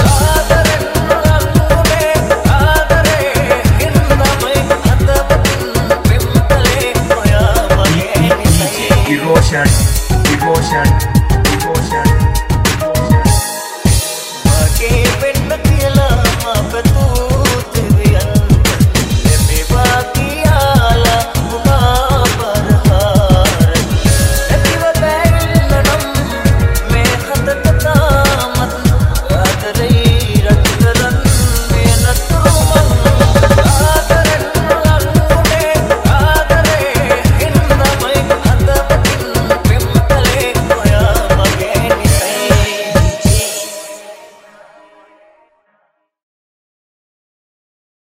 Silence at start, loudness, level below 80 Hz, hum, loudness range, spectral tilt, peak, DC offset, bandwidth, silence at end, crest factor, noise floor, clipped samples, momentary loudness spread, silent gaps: 0 s; -11 LUFS; -18 dBFS; none; 2 LU; -5 dB/octave; 0 dBFS; 0.2%; 16.5 kHz; 3.8 s; 10 dB; -61 dBFS; under 0.1%; 4 LU; none